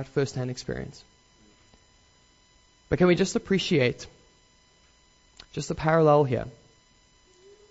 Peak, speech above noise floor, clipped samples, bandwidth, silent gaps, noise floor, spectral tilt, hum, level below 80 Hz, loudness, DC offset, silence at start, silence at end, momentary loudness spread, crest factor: -8 dBFS; 36 dB; under 0.1%; 8 kHz; none; -61 dBFS; -6 dB/octave; none; -52 dBFS; -25 LUFS; under 0.1%; 0 s; 1.2 s; 20 LU; 20 dB